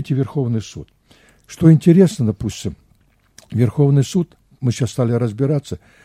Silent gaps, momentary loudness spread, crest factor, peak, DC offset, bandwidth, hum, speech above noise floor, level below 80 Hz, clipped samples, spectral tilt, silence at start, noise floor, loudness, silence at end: none; 16 LU; 18 dB; 0 dBFS; under 0.1%; 12.5 kHz; none; 40 dB; -46 dBFS; under 0.1%; -8 dB/octave; 0 s; -57 dBFS; -17 LUFS; 0.25 s